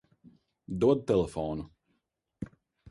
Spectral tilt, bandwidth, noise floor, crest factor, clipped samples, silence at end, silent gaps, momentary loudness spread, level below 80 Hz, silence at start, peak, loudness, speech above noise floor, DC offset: -8 dB/octave; 11.5 kHz; -80 dBFS; 20 dB; under 0.1%; 0.45 s; none; 18 LU; -54 dBFS; 0.7 s; -12 dBFS; -29 LUFS; 52 dB; under 0.1%